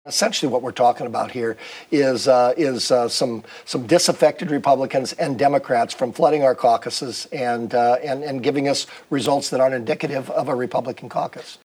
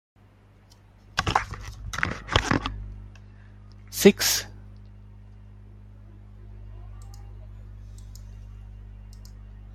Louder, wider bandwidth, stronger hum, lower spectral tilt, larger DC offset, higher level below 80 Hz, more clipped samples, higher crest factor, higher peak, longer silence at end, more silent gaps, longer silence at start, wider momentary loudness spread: first, -20 LUFS vs -24 LUFS; first, over 20 kHz vs 16 kHz; second, none vs 50 Hz at -40 dBFS; about the same, -4 dB/octave vs -3.5 dB/octave; neither; second, -74 dBFS vs -42 dBFS; neither; second, 18 dB vs 28 dB; about the same, -2 dBFS vs -2 dBFS; about the same, 0.1 s vs 0 s; neither; second, 0.05 s vs 1.15 s; second, 10 LU vs 26 LU